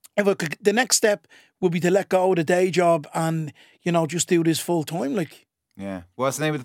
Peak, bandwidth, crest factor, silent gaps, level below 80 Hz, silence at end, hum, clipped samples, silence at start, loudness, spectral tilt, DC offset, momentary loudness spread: -4 dBFS; 17 kHz; 18 dB; none; -70 dBFS; 0 s; none; under 0.1%; 0.15 s; -22 LUFS; -4.5 dB/octave; under 0.1%; 12 LU